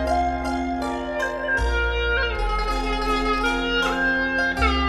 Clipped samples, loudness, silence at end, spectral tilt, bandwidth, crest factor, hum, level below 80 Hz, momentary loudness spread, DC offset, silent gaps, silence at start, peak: under 0.1%; -23 LUFS; 0 s; -5 dB/octave; 13 kHz; 16 dB; none; -30 dBFS; 5 LU; under 0.1%; none; 0 s; -6 dBFS